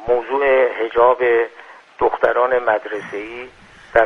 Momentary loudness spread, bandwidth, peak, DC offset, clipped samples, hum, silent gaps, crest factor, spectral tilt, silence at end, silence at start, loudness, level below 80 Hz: 14 LU; 6.4 kHz; 0 dBFS; under 0.1%; under 0.1%; none; none; 18 dB; -5.5 dB/octave; 0 s; 0 s; -17 LUFS; -50 dBFS